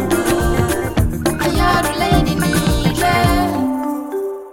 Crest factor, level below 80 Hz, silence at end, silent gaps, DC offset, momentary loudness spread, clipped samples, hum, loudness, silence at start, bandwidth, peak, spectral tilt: 14 dB; -26 dBFS; 0 s; none; 0.9%; 7 LU; under 0.1%; none; -17 LUFS; 0 s; 17 kHz; -2 dBFS; -5 dB/octave